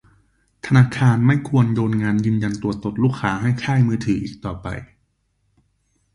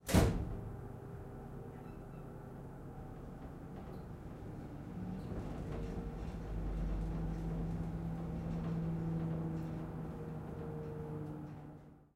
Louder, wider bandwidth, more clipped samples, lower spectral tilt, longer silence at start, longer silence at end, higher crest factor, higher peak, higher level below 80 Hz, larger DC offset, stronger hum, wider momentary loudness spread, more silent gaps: first, -19 LUFS vs -43 LUFS; second, 11 kHz vs 16 kHz; neither; about the same, -7.5 dB/octave vs -7 dB/octave; first, 0.65 s vs 0 s; first, 1.3 s vs 0.1 s; second, 18 dB vs 26 dB; first, -2 dBFS vs -16 dBFS; about the same, -46 dBFS vs -46 dBFS; neither; neither; about the same, 13 LU vs 11 LU; neither